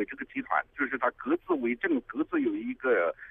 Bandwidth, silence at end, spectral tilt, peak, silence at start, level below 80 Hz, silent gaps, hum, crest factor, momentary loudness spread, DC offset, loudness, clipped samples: 3.8 kHz; 0 s; -8 dB/octave; -12 dBFS; 0 s; -64 dBFS; none; none; 18 dB; 5 LU; under 0.1%; -30 LUFS; under 0.1%